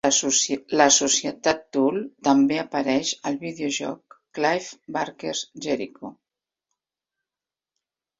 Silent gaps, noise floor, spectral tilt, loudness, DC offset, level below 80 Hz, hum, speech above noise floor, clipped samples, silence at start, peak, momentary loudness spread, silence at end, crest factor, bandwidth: none; under -90 dBFS; -2 dB/octave; -23 LUFS; under 0.1%; -66 dBFS; none; over 67 dB; under 0.1%; 0.05 s; -2 dBFS; 14 LU; 2.1 s; 22 dB; 7.8 kHz